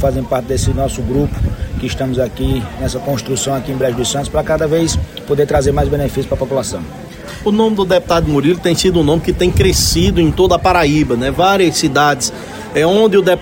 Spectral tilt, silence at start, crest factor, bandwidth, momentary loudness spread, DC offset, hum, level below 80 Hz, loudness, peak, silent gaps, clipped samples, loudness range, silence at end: -5 dB/octave; 0 s; 14 dB; 16.5 kHz; 9 LU; under 0.1%; none; -26 dBFS; -14 LUFS; 0 dBFS; none; under 0.1%; 6 LU; 0 s